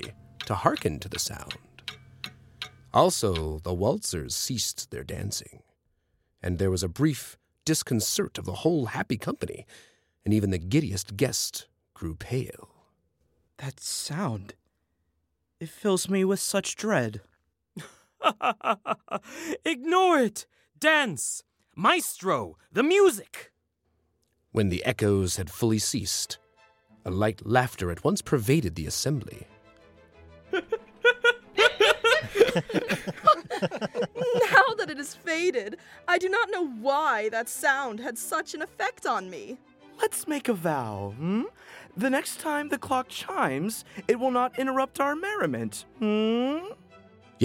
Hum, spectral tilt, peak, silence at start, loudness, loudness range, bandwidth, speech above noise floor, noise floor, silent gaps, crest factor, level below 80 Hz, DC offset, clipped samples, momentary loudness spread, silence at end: none; -4 dB/octave; -4 dBFS; 0 s; -27 LUFS; 7 LU; 16.5 kHz; 49 dB; -76 dBFS; none; 22 dB; -54 dBFS; under 0.1%; under 0.1%; 17 LU; 0 s